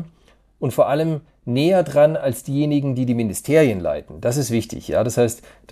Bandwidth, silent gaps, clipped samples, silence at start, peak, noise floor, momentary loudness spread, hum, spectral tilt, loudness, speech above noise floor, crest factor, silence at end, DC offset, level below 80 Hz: 15.5 kHz; none; under 0.1%; 0 s; -4 dBFS; -55 dBFS; 9 LU; none; -6 dB/octave; -20 LUFS; 36 dB; 16 dB; 0.35 s; under 0.1%; -50 dBFS